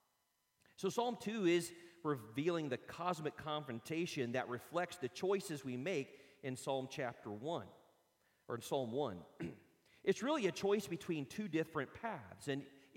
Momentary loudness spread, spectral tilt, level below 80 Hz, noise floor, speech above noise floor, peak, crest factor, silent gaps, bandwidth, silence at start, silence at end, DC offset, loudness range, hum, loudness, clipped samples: 10 LU; -5 dB/octave; -80 dBFS; -82 dBFS; 42 dB; -22 dBFS; 20 dB; none; 16.5 kHz; 0.8 s; 0.15 s; under 0.1%; 4 LU; none; -41 LUFS; under 0.1%